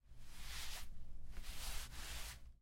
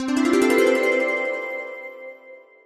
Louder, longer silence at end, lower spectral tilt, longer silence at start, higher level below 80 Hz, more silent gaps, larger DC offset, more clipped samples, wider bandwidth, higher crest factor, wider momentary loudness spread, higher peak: second, -51 LUFS vs -20 LUFS; second, 0.05 s vs 0.25 s; second, -1.5 dB/octave vs -3 dB/octave; about the same, 0.05 s vs 0 s; first, -52 dBFS vs -64 dBFS; neither; neither; neither; about the same, 16.5 kHz vs 15 kHz; about the same, 14 dB vs 16 dB; second, 10 LU vs 19 LU; second, -30 dBFS vs -6 dBFS